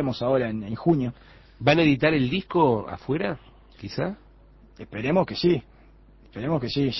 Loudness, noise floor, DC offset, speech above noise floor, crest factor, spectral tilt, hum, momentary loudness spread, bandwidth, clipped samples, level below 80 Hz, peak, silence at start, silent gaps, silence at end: -24 LUFS; -52 dBFS; under 0.1%; 28 dB; 18 dB; -7.5 dB/octave; none; 15 LU; 6.2 kHz; under 0.1%; -50 dBFS; -6 dBFS; 0 s; none; 0 s